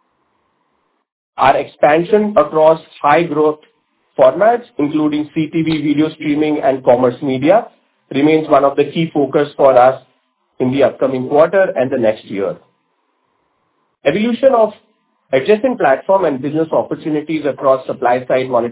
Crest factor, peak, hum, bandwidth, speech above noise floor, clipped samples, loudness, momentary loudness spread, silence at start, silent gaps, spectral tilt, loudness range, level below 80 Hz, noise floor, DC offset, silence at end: 14 dB; 0 dBFS; none; 4 kHz; 51 dB; under 0.1%; -14 LUFS; 8 LU; 1.35 s; none; -10.5 dB/octave; 4 LU; -56 dBFS; -64 dBFS; under 0.1%; 0 s